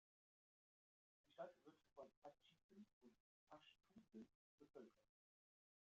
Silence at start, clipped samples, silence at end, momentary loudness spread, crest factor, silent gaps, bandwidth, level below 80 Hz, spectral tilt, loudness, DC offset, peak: 1.25 s; under 0.1%; 0.8 s; 8 LU; 24 dB; 2.17-2.22 s, 2.63-2.69 s, 2.93-3.01 s, 3.20-3.47 s, 4.35-4.58 s; 7 kHz; under -90 dBFS; -4 dB/octave; -65 LUFS; under 0.1%; -44 dBFS